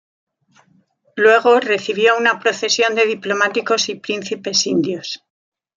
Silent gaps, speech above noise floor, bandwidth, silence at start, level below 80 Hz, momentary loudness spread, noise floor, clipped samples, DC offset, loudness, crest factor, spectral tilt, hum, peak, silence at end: none; 41 dB; 7.6 kHz; 1.15 s; -70 dBFS; 11 LU; -58 dBFS; under 0.1%; under 0.1%; -16 LUFS; 16 dB; -2.5 dB/octave; none; -2 dBFS; 0.6 s